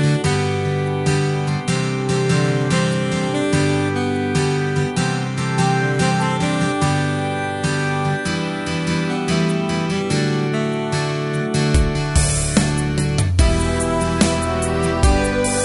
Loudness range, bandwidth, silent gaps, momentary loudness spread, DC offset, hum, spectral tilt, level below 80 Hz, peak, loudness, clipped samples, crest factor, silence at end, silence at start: 2 LU; 11.5 kHz; none; 4 LU; under 0.1%; none; -5 dB/octave; -28 dBFS; -2 dBFS; -19 LUFS; under 0.1%; 16 dB; 0 s; 0 s